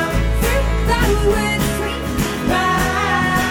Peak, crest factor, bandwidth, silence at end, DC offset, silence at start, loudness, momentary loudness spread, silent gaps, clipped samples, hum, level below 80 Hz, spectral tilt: -4 dBFS; 14 dB; 17.5 kHz; 0 s; under 0.1%; 0 s; -18 LUFS; 5 LU; none; under 0.1%; none; -22 dBFS; -5 dB/octave